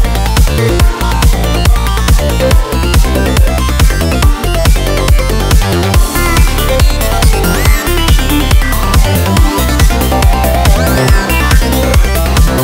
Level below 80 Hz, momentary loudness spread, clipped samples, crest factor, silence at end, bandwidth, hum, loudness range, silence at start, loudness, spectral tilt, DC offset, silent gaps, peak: -10 dBFS; 1 LU; 0.3%; 8 dB; 0 s; 16.5 kHz; none; 1 LU; 0 s; -10 LUFS; -5 dB/octave; under 0.1%; none; 0 dBFS